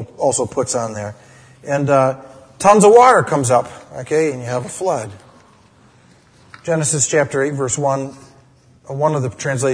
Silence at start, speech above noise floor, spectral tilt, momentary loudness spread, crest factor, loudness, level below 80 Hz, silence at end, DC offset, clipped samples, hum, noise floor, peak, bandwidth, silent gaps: 0 s; 34 dB; -4.5 dB/octave; 20 LU; 18 dB; -16 LUFS; -56 dBFS; 0 s; under 0.1%; under 0.1%; none; -50 dBFS; 0 dBFS; 11 kHz; none